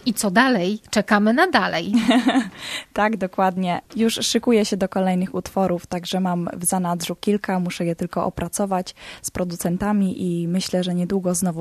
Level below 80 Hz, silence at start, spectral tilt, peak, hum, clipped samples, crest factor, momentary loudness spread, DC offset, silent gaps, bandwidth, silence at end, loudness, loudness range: -52 dBFS; 0.05 s; -4.5 dB/octave; 0 dBFS; none; under 0.1%; 20 dB; 8 LU; under 0.1%; none; 14 kHz; 0 s; -21 LUFS; 5 LU